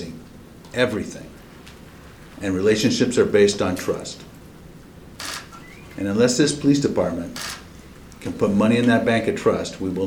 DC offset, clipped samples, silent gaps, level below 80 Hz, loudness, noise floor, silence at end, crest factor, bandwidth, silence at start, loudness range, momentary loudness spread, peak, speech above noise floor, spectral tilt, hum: under 0.1%; under 0.1%; none; -48 dBFS; -21 LUFS; -43 dBFS; 0 s; 18 dB; 19.5 kHz; 0 s; 3 LU; 21 LU; -4 dBFS; 23 dB; -5 dB/octave; none